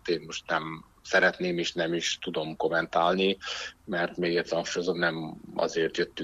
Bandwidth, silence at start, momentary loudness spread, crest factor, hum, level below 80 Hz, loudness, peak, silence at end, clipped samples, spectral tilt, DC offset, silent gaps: 12.5 kHz; 0.05 s; 10 LU; 18 dB; none; -62 dBFS; -28 LUFS; -10 dBFS; 0 s; under 0.1%; -4 dB/octave; under 0.1%; none